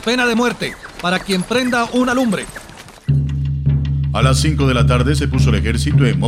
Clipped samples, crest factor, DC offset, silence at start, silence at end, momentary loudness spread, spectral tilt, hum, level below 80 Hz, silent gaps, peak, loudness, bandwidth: under 0.1%; 16 dB; under 0.1%; 0 s; 0 s; 9 LU; -6 dB/octave; none; -26 dBFS; none; 0 dBFS; -16 LUFS; 13.5 kHz